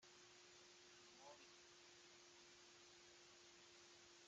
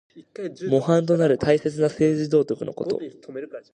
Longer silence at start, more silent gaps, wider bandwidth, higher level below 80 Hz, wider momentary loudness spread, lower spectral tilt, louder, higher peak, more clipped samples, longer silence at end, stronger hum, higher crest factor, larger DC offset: second, 0 s vs 0.15 s; neither; second, 8.8 kHz vs 9.8 kHz; second, under -90 dBFS vs -58 dBFS; second, 2 LU vs 16 LU; second, -1 dB/octave vs -7.5 dB/octave; second, -65 LUFS vs -22 LUFS; second, -52 dBFS vs -6 dBFS; neither; second, 0 s vs 0.15 s; neither; about the same, 16 dB vs 18 dB; neither